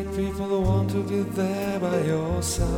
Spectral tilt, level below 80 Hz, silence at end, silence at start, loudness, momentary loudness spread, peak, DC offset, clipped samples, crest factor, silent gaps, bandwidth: -6 dB/octave; -36 dBFS; 0 s; 0 s; -25 LUFS; 3 LU; -10 dBFS; under 0.1%; under 0.1%; 14 dB; none; 18 kHz